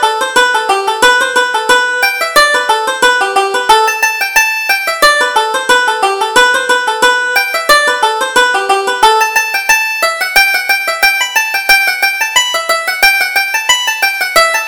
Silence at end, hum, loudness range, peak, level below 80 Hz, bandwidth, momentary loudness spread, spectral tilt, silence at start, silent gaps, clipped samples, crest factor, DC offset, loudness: 0 s; none; 1 LU; 0 dBFS; -44 dBFS; over 20 kHz; 4 LU; 1 dB/octave; 0 s; none; 0.2%; 10 dB; under 0.1%; -9 LUFS